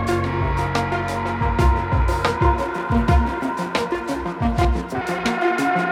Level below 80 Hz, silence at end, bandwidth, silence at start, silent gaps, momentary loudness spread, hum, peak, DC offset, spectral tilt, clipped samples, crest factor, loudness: -26 dBFS; 0 s; 14 kHz; 0 s; none; 5 LU; none; -6 dBFS; under 0.1%; -6.5 dB/octave; under 0.1%; 14 dB; -21 LUFS